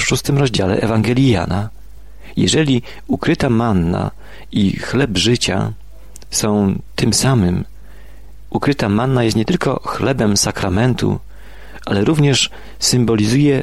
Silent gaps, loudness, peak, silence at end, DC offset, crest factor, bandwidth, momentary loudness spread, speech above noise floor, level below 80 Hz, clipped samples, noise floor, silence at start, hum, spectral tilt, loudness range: none; -16 LUFS; -2 dBFS; 0 s; 2%; 14 dB; 13.5 kHz; 9 LU; 23 dB; -38 dBFS; under 0.1%; -39 dBFS; 0 s; none; -5 dB/octave; 2 LU